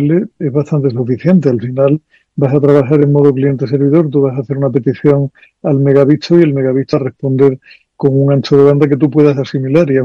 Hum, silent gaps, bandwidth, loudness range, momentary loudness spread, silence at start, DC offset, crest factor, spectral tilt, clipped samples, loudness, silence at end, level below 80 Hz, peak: none; none; 6.8 kHz; 1 LU; 7 LU; 0 s; under 0.1%; 10 dB; -9.5 dB/octave; 1%; -12 LUFS; 0 s; -52 dBFS; 0 dBFS